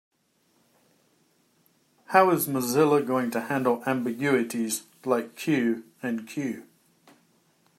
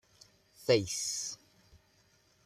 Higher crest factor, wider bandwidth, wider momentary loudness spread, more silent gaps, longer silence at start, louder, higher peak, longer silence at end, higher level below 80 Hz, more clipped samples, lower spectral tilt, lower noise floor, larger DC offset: about the same, 24 dB vs 24 dB; about the same, 16 kHz vs 15 kHz; about the same, 11 LU vs 12 LU; neither; first, 2.1 s vs 0.6 s; first, -26 LUFS vs -32 LUFS; first, -4 dBFS vs -14 dBFS; about the same, 1.15 s vs 1.1 s; second, -76 dBFS vs -70 dBFS; neither; first, -5 dB/octave vs -3 dB/octave; about the same, -68 dBFS vs -68 dBFS; neither